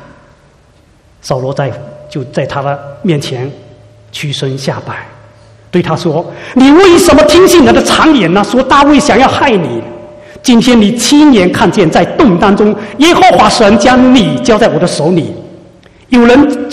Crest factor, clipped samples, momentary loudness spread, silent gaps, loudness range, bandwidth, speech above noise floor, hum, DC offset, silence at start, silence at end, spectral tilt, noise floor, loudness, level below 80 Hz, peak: 8 dB; 2%; 14 LU; none; 11 LU; 15.5 kHz; 37 dB; none; under 0.1%; 1.25 s; 0 s; -5 dB/octave; -44 dBFS; -7 LUFS; -34 dBFS; 0 dBFS